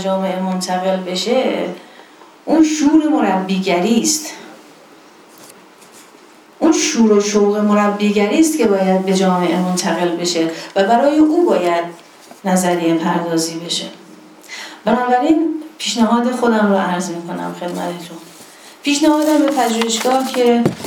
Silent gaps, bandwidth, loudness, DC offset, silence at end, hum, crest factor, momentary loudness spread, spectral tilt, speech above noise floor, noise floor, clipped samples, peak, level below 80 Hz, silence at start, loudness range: none; 18.5 kHz; -16 LUFS; under 0.1%; 0 s; none; 16 dB; 11 LU; -4.5 dB/octave; 29 dB; -44 dBFS; under 0.1%; 0 dBFS; -60 dBFS; 0 s; 5 LU